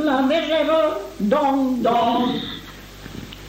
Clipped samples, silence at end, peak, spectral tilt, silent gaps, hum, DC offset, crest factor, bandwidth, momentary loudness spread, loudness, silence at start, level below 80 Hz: under 0.1%; 0 s; -6 dBFS; -5.5 dB/octave; none; none; under 0.1%; 14 dB; 16 kHz; 18 LU; -20 LUFS; 0 s; -48 dBFS